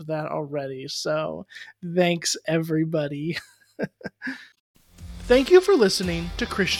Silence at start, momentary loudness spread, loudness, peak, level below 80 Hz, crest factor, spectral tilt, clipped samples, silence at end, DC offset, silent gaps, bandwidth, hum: 0 s; 19 LU; -23 LUFS; -4 dBFS; -46 dBFS; 20 dB; -4.5 dB/octave; under 0.1%; 0 s; under 0.1%; 4.60-4.74 s; 16 kHz; none